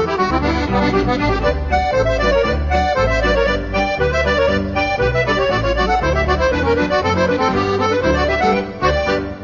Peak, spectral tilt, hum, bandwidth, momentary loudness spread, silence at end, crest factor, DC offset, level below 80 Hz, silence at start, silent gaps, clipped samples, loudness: -4 dBFS; -6 dB/octave; none; 7.4 kHz; 2 LU; 0 s; 14 dB; 0.2%; -26 dBFS; 0 s; none; under 0.1%; -16 LUFS